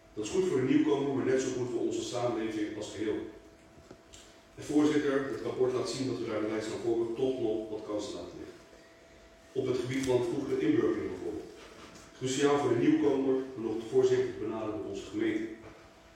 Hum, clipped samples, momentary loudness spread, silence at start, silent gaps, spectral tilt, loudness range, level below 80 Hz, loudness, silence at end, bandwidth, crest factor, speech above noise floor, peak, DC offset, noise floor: none; under 0.1%; 15 LU; 0.15 s; none; -5.5 dB/octave; 5 LU; -64 dBFS; -31 LUFS; 0.25 s; 12 kHz; 18 dB; 26 dB; -14 dBFS; under 0.1%; -56 dBFS